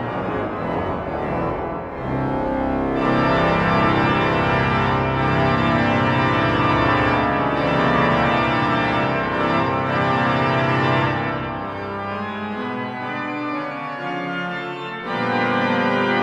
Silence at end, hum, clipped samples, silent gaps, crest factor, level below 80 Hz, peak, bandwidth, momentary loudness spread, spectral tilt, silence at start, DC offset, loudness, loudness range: 0 s; none; under 0.1%; none; 16 dB; -40 dBFS; -4 dBFS; 8.8 kHz; 9 LU; -7.5 dB/octave; 0 s; under 0.1%; -20 LUFS; 7 LU